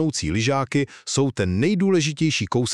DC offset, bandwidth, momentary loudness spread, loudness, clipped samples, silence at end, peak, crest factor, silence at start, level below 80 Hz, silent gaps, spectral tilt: under 0.1%; 11.5 kHz; 4 LU; -22 LUFS; under 0.1%; 0 s; -6 dBFS; 16 dB; 0 s; -46 dBFS; none; -5 dB/octave